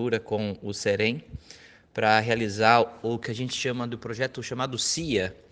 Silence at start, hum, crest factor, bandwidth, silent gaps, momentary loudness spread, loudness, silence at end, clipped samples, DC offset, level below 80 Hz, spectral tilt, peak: 0 s; none; 24 dB; 10.5 kHz; none; 11 LU; -26 LUFS; 0.15 s; under 0.1%; under 0.1%; -56 dBFS; -4 dB/octave; -2 dBFS